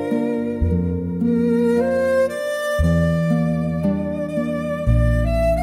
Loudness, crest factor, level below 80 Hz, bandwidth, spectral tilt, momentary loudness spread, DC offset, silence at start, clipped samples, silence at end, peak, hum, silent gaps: -20 LUFS; 12 dB; -28 dBFS; 14.5 kHz; -8 dB/octave; 6 LU; under 0.1%; 0 s; under 0.1%; 0 s; -6 dBFS; none; none